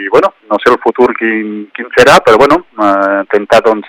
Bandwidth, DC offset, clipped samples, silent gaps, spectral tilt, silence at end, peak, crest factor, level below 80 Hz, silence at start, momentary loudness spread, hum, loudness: 18 kHz; under 0.1%; 6%; none; -4.5 dB/octave; 0 s; 0 dBFS; 8 dB; -42 dBFS; 0 s; 9 LU; none; -9 LUFS